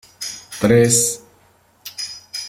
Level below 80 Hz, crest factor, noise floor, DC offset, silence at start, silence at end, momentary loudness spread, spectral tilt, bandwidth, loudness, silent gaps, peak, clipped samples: -54 dBFS; 20 dB; -55 dBFS; under 0.1%; 0.2 s; 0 s; 20 LU; -4 dB/octave; 17 kHz; -17 LUFS; none; 0 dBFS; under 0.1%